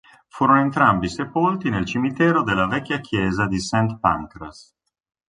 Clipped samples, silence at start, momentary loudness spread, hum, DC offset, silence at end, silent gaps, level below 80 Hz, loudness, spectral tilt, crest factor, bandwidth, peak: under 0.1%; 0.35 s; 8 LU; none; under 0.1%; 0.75 s; none; -46 dBFS; -20 LUFS; -6 dB/octave; 18 dB; 11 kHz; -2 dBFS